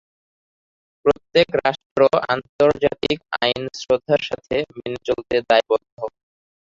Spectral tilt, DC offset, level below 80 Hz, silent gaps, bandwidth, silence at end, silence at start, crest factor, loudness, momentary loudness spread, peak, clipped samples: -5 dB/octave; under 0.1%; -52 dBFS; 1.86-1.96 s, 2.49-2.59 s, 5.92-5.97 s; 7.6 kHz; 0.65 s; 1.05 s; 20 dB; -20 LUFS; 9 LU; 0 dBFS; under 0.1%